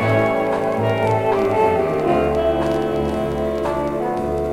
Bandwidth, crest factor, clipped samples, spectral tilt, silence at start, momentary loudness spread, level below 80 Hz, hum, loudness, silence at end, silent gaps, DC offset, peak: 16 kHz; 14 dB; under 0.1%; -7.5 dB/octave; 0 s; 5 LU; -38 dBFS; none; -19 LUFS; 0 s; none; under 0.1%; -6 dBFS